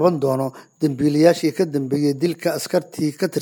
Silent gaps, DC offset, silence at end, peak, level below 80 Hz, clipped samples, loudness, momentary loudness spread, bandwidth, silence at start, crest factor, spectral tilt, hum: none; under 0.1%; 0 s; -2 dBFS; -64 dBFS; under 0.1%; -20 LUFS; 9 LU; 19 kHz; 0 s; 18 dB; -6 dB/octave; none